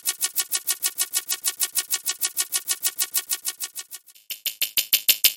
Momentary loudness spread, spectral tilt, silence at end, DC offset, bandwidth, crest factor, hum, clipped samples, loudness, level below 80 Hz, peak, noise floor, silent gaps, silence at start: 12 LU; 3.5 dB/octave; 0 s; under 0.1%; 17 kHz; 26 dB; none; under 0.1%; -23 LUFS; -78 dBFS; 0 dBFS; -43 dBFS; none; 0.05 s